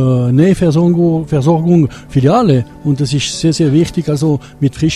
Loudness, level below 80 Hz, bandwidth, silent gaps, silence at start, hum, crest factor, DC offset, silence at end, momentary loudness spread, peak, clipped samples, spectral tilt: -12 LUFS; -38 dBFS; 12 kHz; none; 0 s; none; 12 dB; under 0.1%; 0 s; 5 LU; 0 dBFS; under 0.1%; -7 dB/octave